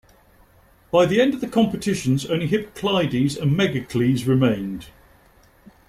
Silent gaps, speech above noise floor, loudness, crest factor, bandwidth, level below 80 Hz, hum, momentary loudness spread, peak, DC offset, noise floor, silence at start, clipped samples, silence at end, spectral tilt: none; 34 dB; -21 LUFS; 18 dB; 15 kHz; -52 dBFS; none; 6 LU; -4 dBFS; under 0.1%; -54 dBFS; 0.95 s; under 0.1%; 1 s; -6.5 dB/octave